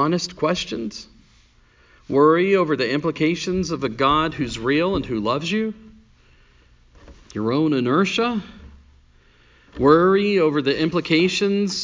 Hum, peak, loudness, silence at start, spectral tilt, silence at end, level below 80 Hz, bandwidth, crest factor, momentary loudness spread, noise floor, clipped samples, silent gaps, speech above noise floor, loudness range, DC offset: none; -2 dBFS; -20 LUFS; 0 s; -5.5 dB/octave; 0 s; -48 dBFS; 7.6 kHz; 18 dB; 12 LU; -55 dBFS; under 0.1%; none; 35 dB; 5 LU; under 0.1%